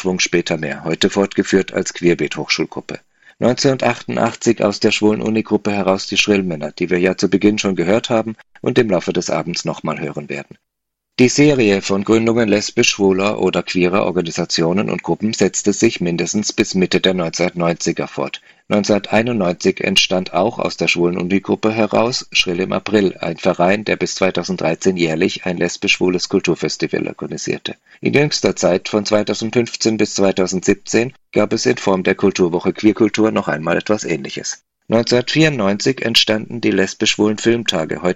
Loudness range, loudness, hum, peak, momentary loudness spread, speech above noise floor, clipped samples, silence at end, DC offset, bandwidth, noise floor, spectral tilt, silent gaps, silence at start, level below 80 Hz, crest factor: 2 LU; -17 LUFS; none; 0 dBFS; 8 LU; 61 dB; under 0.1%; 0 s; under 0.1%; 13.5 kHz; -78 dBFS; -4.5 dB/octave; none; 0 s; -52 dBFS; 16 dB